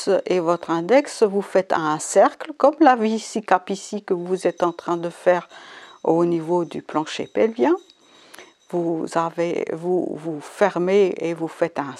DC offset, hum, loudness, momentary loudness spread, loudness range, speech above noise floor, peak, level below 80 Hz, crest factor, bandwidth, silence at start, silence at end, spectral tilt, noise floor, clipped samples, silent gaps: under 0.1%; none; -21 LUFS; 9 LU; 5 LU; 26 dB; 0 dBFS; -74 dBFS; 20 dB; 12 kHz; 0 s; 0 s; -5.5 dB/octave; -47 dBFS; under 0.1%; none